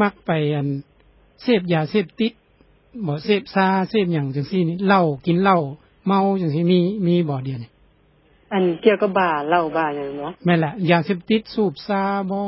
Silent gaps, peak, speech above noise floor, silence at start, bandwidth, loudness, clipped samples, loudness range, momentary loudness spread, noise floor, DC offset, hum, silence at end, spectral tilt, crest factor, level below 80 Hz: none; -2 dBFS; 37 dB; 0 s; 5.8 kHz; -20 LUFS; under 0.1%; 3 LU; 9 LU; -56 dBFS; under 0.1%; none; 0 s; -11.5 dB/octave; 18 dB; -58 dBFS